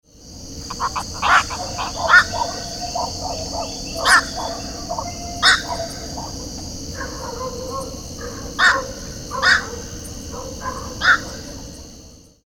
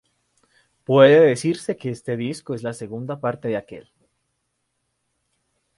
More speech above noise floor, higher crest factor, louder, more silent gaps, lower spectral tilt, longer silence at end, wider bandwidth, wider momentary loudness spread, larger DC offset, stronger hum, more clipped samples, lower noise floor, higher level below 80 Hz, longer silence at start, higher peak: second, 23 dB vs 55 dB; about the same, 22 dB vs 22 dB; about the same, -20 LUFS vs -20 LUFS; neither; second, -2 dB/octave vs -6 dB/octave; second, 0.25 s vs 1.95 s; first, 18 kHz vs 11.5 kHz; about the same, 17 LU vs 17 LU; neither; second, none vs 60 Hz at -50 dBFS; neither; second, -44 dBFS vs -74 dBFS; first, -40 dBFS vs -66 dBFS; second, 0.15 s vs 0.9 s; about the same, 0 dBFS vs 0 dBFS